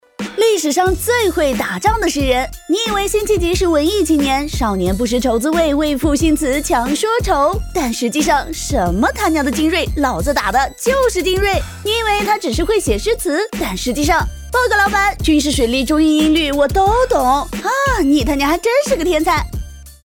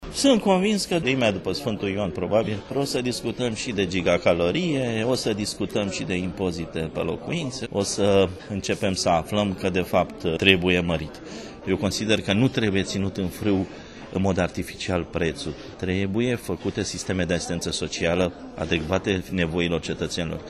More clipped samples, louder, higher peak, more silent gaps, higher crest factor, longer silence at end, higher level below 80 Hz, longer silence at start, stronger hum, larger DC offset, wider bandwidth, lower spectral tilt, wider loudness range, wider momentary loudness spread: neither; first, -15 LUFS vs -24 LUFS; about the same, 0 dBFS vs 0 dBFS; neither; second, 14 dB vs 24 dB; about the same, 0.1 s vs 0 s; first, -28 dBFS vs -46 dBFS; first, 0.2 s vs 0 s; neither; neither; first, 19.5 kHz vs 13 kHz; about the same, -4 dB/octave vs -5 dB/octave; about the same, 2 LU vs 4 LU; second, 5 LU vs 8 LU